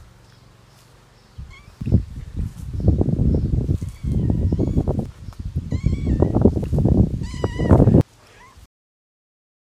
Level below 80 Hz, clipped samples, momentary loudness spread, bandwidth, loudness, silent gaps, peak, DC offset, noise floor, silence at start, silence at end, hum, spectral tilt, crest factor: -28 dBFS; under 0.1%; 16 LU; 10 kHz; -20 LUFS; none; 0 dBFS; under 0.1%; -50 dBFS; 0 s; 1.6 s; none; -9.5 dB/octave; 20 dB